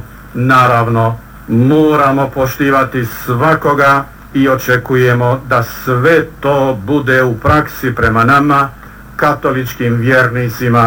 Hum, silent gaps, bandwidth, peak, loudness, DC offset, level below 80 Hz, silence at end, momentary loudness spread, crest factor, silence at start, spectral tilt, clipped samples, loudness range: none; none; 18.5 kHz; 0 dBFS; -12 LUFS; under 0.1%; -36 dBFS; 0 s; 8 LU; 10 dB; 0 s; -7 dB/octave; under 0.1%; 1 LU